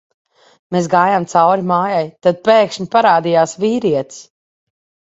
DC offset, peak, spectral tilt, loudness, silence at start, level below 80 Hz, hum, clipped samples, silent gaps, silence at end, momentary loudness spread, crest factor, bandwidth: under 0.1%; 0 dBFS; -5.5 dB/octave; -14 LUFS; 0.7 s; -60 dBFS; none; under 0.1%; none; 0.85 s; 7 LU; 16 dB; 8 kHz